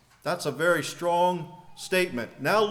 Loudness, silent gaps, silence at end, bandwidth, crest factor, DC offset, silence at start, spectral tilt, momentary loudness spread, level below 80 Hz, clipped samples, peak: -26 LUFS; none; 0 s; 18 kHz; 16 dB; under 0.1%; 0.25 s; -4 dB/octave; 10 LU; -66 dBFS; under 0.1%; -10 dBFS